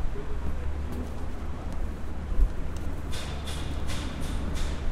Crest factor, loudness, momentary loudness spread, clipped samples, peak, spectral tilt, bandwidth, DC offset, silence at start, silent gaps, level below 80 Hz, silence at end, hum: 18 dB; -35 LUFS; 6 LU; under 0.1%; -10 dBFS; -5.5 dB/octave; 13 kHz; 0.5%; 0 s; none; -32 dBFS; 0 s; none